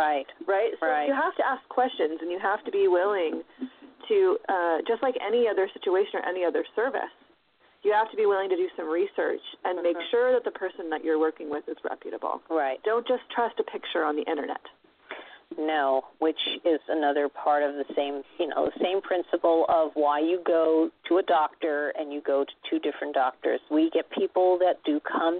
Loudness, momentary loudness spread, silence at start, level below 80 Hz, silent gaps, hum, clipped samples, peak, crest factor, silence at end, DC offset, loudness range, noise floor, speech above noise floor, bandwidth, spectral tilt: -27 LUFS; 9 LU; 0 s; -72 dBFS; none; none; under 0.1%; -12 dBFS; 14 dB; 0 s; under 0.1%; 4 LU; -63 dBFS; 37 dB; 4.4 kHz; -7.5 dB/octave